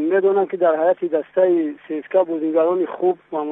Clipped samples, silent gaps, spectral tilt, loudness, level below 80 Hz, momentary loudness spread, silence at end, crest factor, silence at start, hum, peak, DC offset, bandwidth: under 0.1%; none; -9.5 dB/octave; -19 LUFS; -74 dBFS; 5 LU; 0 s; 14 dB; 0 s; none; -6 dBFS; under 0.1%; 3.9 kHz